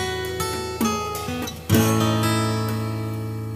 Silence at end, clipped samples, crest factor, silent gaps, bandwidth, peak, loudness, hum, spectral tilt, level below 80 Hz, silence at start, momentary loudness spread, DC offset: 0 s; under 0.1%; 18 dB; none; 15.5 kHz; -4 dBFS; -23 LUFS; none; -5 dB/octave; -46 dBFS; 0 s; 9 LU; under 0.1%